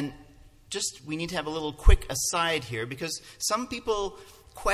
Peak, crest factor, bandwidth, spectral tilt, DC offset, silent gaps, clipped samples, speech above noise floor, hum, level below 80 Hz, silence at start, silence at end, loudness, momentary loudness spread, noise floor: -6 dBFS; 22 dB; 15 kHz; -3.5 dB/octave; under 0.1%; none; under 0.1%; 26 dB; none; -32 dBFS; 0 s; 0 s; -29 LUFS; 11 LU; -53 dBFS